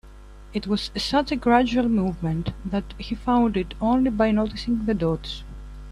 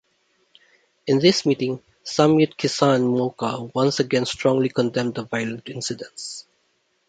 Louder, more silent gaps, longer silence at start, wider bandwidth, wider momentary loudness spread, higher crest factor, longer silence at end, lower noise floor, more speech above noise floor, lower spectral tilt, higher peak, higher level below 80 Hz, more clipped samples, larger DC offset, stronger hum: about the same, -23 LUFS vs -21 LUFS; neither; second, 0.05 s vs 1.05 s; first, 11.5 kHz vs 9.4 kHz; about the same, 13 LU vs 15 LU; about the same, 18 dB vs 20 dB; second, 0 s vs 0.65 s; second, -43 dBFS vs -68 dBFS; second, 21 dB vs 47 dB; first, -6.5 dB/octave vs -5 dB/octave; second, -6 dBFS vs -2 dBFS; first, -38 dBFS vs -62 dBFS; neither; neither; first, 50 Hz at -40 dBFS vs none